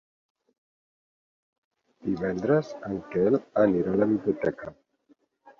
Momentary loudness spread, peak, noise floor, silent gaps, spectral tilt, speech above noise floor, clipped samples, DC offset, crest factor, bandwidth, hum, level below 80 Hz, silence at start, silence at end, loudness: 12 LU; -10 dBFS; -65 dBFS; none; -9 dB/octave; 39 dB; under 0.1%; under 0.1%; 20 dB; 7 kHz; none; -60 dBFS; 2.05 s; 0.1 s; -26 LUFS